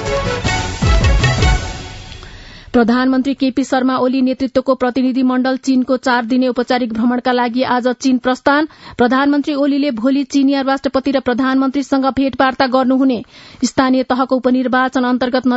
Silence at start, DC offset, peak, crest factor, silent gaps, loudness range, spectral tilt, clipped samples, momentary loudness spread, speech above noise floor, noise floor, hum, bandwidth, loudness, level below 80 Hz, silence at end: 0 s; under 0.1%; 0 dBFS; 14 dB; none; 1 LU; -5.5 dB/octave; under 0.1%; 4 LU; 21 dB; -35 dBFS; none; 8 kHz; -15 LUFS; -28 dBFS; 0 s